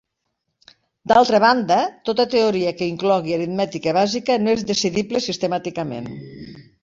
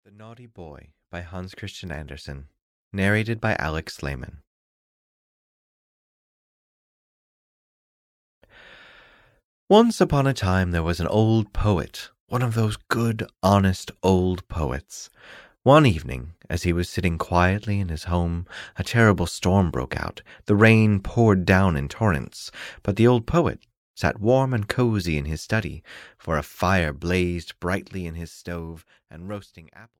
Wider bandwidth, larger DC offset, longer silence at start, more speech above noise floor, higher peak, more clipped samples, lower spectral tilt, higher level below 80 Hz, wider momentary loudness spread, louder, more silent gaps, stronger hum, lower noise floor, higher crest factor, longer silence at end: second, 7.8 kHz vs 15.5 kHz; neither; first, 1.05 s vs 0.2 s; first, 57 dB vs 32 dB; about the same, -2 dBFS vs -4 dBFS; neither; second, -4.5 dB/octave vs -6.5 dB/octave; second, -58 dBFS vs -40 dBFS; about the same, 17 LU vs 18 LU; first, -19 LUFS vs -22 LUFS; second, none vs 2.62-2.91 s, 4.47-8.41 s, 9.45-9.67 s, 12.20-12.27 s, 23.77-23.94 s; neither; first, -76 dBFS vs -55 dBFS; about the same, 18 dB vs 20 dB; about the same, 0.2 s vs 0.15 s